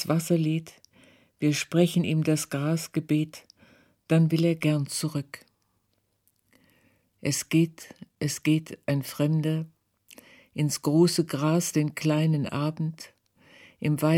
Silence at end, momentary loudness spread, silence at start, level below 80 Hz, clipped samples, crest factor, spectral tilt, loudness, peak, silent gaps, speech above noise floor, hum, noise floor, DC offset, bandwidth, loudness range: 0 s; 11 LU; 0 s; -70 dBFS; under 0.1%; 18 dB; -6 dB/octave; -26 LUFS; -10 dBFS; none; 48 dB; none; -73 dBFS; under 0.1%; 16.5 kHz; 5 LU